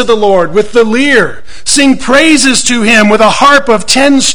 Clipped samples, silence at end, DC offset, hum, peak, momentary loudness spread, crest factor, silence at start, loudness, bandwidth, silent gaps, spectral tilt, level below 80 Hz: 4%; 0 s; 10%; none; 0 dBFS; 5 LU; 8 dB; 0 s; -6 LUFS; over 20 kHz; none; -2.5 dB/octave; -34 dBFS